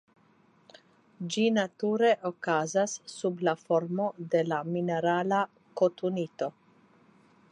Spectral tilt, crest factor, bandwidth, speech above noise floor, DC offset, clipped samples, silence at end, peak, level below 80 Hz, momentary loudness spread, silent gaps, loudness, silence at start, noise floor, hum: -5 dB/octave; 18 dB; 11 kHz; 35 dB; under 0.1%; under 0.1%; 1 s; -12 dBFS; -82 dBFS; 8 LU; none; -29 LUFS; 1.2 s; -64 dBFS; none